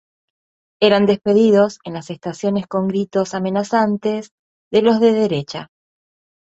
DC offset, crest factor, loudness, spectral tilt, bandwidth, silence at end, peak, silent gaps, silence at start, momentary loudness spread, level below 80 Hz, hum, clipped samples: under 0.1%; 18 dB; -17 LUFS; -6 dB/octave; 8 kHz; 0.8 s; 0 dBFS; 4.31-4.71 s; 0.8 s; 14 LU; -60 dBFS; none; under 0.1%